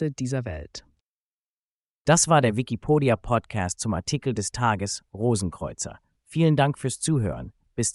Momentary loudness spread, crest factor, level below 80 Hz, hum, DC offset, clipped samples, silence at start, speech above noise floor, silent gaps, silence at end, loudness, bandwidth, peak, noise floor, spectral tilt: 14 LU; 20 dB; -48 dBFS; none; under 0.1%; under 0.1%; 0 s; over 66 dB; 1.02-2.05 s; 0 s; -25 LUFS; 11.5 kHz; -4 dBFS; under -90 dBFS; -5 dB/octave